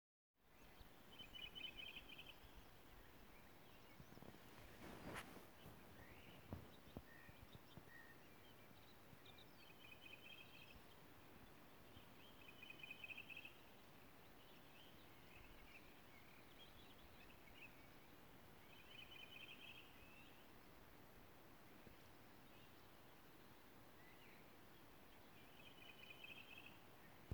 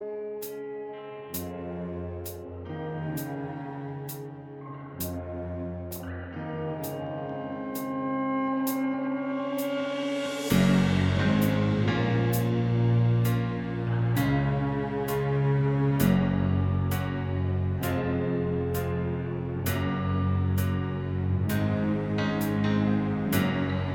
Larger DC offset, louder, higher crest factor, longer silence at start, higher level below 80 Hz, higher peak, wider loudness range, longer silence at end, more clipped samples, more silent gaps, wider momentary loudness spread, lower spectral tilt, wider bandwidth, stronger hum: neither; second, -61 LUFS vs -28 LUFS; first, 26 dB vs 18 dB; first, 0.35 s vs 0 s; second, -76 dBFS vs -48 dBFS; second, -36 dBFS vs -10 dBFS; second, 7 LU vs 11 LU; about the same, 0 s vs 0 s; neither; neither; about the same, 10 LU vs 12 LU; second, -4 dB/octave vs -7 dB/octave; about the same, over 20 kHz vs over 20 kHz; neither